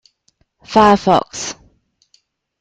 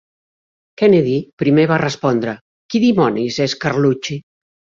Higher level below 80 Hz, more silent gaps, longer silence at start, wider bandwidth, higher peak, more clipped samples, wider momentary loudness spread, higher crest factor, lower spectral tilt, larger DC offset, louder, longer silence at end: first, -46 dBFS vs -56 dBFS; second, none vs 1.33-1.37 s, 2.41-2.69 s; about the same, 0.7 s vs 0.8 s; first, 9.2 kHz vs 7.6 kHz; about the same, 0 dBFS vs -2 dBFS; neither; first, 16 LU vs 11 LU; about the same, 18 dB vs 14 dB; second, -4.5 dB/octave vs -6.5 dB/octave; neither; about the same, -14 LUFS vs -16 LUFS; first, 1.1 s vs 0.5 s